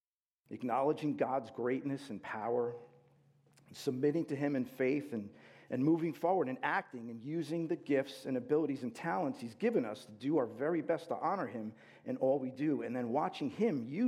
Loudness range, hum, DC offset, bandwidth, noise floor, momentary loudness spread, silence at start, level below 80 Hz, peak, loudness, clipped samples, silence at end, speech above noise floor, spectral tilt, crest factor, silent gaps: 3 LU; none; under 0.1%; 14 kHz; -79 dBFS; 10 LU; 0.5 s; -86 dBFS; -18 dBFS; -36 LUFS; under 0.1%; 0 s; 43 dB; -7 dB/octave; 18 dB; none